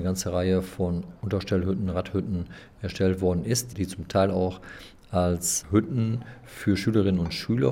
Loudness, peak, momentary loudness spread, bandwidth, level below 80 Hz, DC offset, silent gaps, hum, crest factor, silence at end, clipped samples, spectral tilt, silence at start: -26 LUFS; -8 dBFS; 10 LU; 17 kHz; -52 dBFS; under 0.1%; none; none; 18 dB; 0 s; under 0.1%; -5.5 dB/octave; 0 s